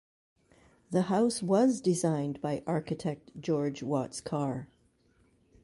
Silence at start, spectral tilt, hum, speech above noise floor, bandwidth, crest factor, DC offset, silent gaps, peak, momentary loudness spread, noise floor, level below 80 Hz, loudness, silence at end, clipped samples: 0.9 s; -6 dB/octave; none; 38 dB; 11.5 kHz; 18 dB; under 0.1%; none; -14 dBFS; 9 LU; -67 dBFS; -68 dBFS; -31 LUFS; 1 s; under 0.1%